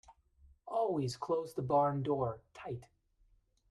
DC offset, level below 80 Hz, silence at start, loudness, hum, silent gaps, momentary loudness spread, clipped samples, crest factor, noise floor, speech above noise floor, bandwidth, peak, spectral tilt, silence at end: under 0.1%; -66 dBFS; 0.1 s; -35 LUFS; none; none; 14 LU; under 0.1%; 18 dB; -71 dBFS; 36 dB; 13.5 kHz; -18 dBFS; -7 dB/octave; 0.85 s